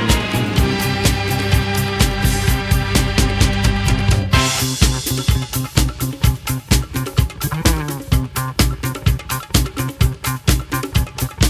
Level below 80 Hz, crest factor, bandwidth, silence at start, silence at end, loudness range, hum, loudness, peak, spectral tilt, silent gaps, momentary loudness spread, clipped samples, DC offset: -22 dBFS; 16 dB; 16 kHz; 0 s; 0 s; 3 LU; none; -18 LUFS; 0 dBFS; -4.5 dB/octave; none; 5 LU; under 0.1%; under 0.1%